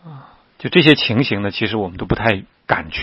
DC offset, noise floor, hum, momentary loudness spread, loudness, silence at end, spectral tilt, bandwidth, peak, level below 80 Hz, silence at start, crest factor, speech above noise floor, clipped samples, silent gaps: under 0.1%; -42 dBFS; none; 11 LU; -17 LUFS; 0 s; -7.5 dB/octave; 10 kHz; 0 dBFS; -42 dBFS; 0.05 s; 18 dB; 25 dB; under 0.1%; none